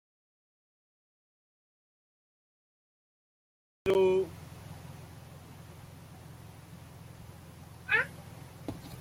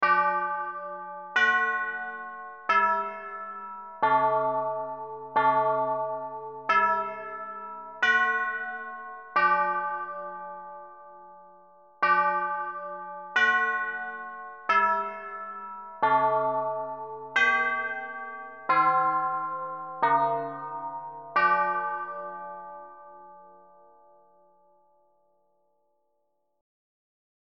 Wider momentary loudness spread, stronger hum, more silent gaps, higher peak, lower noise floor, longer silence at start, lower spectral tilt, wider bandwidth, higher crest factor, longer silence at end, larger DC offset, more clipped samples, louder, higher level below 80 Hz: first, 23 LU vs 16 LU; neither; neither; second, -16 dBFS vs -10 dBFS; second, -50 dBFS vs -77 dBFS; first, 3.85 s vs 0 s; first, -6 dB/octave vs -0.5 dB/octave; first, 16 kHz vs 7.4 kHz; about the same, 22 dB vs 18 dB; second, 0 s vs 4.05 s; neither; neither; second, -31 LUFS vs -27 LUFS; first, -64 dBFS vs -70 dBFS